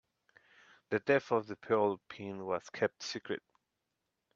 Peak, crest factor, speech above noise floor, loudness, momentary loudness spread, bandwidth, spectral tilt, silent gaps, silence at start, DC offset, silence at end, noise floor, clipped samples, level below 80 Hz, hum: -16 dBFS; 20 dB; 51 dB; -35 LUFS; 12 LU; 7.4 kHz; -5 dB/octave; none; 0.9 s; under 0.1%; 1 s; -86 dBFS; under 0.1%; -80 dBFS; none